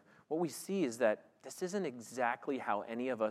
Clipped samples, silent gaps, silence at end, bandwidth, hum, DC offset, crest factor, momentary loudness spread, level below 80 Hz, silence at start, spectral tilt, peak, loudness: under 0.1%; none; 0 s; 16 kHz; none; under 0.1%; 20 dB; 8 LU; under -90 dBFS; 0.3 s; -5 dB/octave; -18 dBFS; -37 LUFS